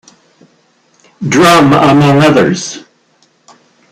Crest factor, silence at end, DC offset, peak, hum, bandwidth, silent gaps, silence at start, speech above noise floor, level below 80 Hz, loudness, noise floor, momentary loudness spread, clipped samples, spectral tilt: 10 dB; 1.1 s; under 0.1%; 0 dBFS; none; 15.5 kHz; none; 1.2 s; 45 dB; -46 dBFS; -7 LUFS; -52 dBFS; 17 LU; under 0.1%; -5.5 dB/octave